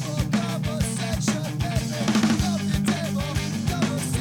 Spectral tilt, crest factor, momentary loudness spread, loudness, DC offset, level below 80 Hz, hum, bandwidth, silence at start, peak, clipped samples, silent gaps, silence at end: -5 dB/octave; 10 dB; 4 LU; -25 LUFS; under 0.1%; -38 dBFS; none; 18.5 kHz; 0 s; -14 dBFS; under 0.1%; none; 0 s